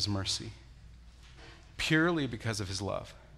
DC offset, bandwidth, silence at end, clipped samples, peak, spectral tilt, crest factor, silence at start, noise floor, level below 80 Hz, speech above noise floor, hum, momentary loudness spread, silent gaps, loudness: under 0.1%; 13.5 kHz; 0 s; under 0.1%; -14 dBFS; -4 dB/octave; 20 dB; 0 s; -53 dBFS; -54 dBFS; 21 dB; none; 25 LU; none; -32 LUFS